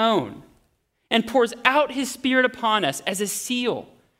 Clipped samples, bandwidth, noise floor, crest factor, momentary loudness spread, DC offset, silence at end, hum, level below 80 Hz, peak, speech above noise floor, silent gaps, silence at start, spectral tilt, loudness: under 0.1%; 16 kHz; -68 dBFS; 22 dB; 6 LU; under 0.1%; 0.35 s; none; -64 dBFS; 0 dBFS; 46 dB; none; 0 s; -3 dB/octave; -22 LUFS